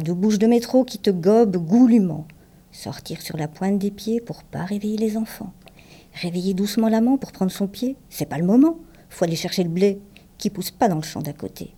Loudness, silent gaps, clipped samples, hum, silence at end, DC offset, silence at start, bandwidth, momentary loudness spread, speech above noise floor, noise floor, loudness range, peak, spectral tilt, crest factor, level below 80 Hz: -21 LUFS; none; under 0.1%; none; 0.1 s; under 0.1%; 0 s; 17.5 kHz; 16 LU; 26 dB; -47 dBFS; 7 LU; -6 dBFS; -6.5 dB/octave; 16 dB; -54 dBFS